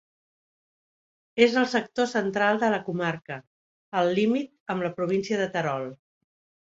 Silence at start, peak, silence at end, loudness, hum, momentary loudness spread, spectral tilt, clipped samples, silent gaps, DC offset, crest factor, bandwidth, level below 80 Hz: 1.35 s; -4 dBFS; 0.7 s; -26 LUFS; none; 12 LU; -5.5 dB/octave; under 0.1%; 3.47-3.92 s, 4.60-4.66 s; under 0.1%; 24 dB; 8 kHz; -70 dBFS